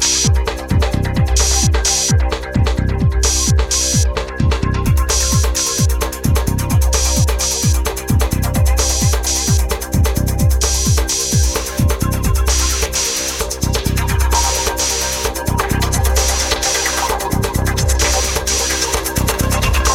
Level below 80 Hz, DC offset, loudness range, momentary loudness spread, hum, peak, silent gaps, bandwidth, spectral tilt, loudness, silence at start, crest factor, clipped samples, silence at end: -18 dBFS; under 0.1%; 1 LU; 4 LU; none; -2 dBFS; none; 17 kHz; -3.5 dB/octave; -15 LUFS; 0 s; 14 dB; under 0.1%; 0 s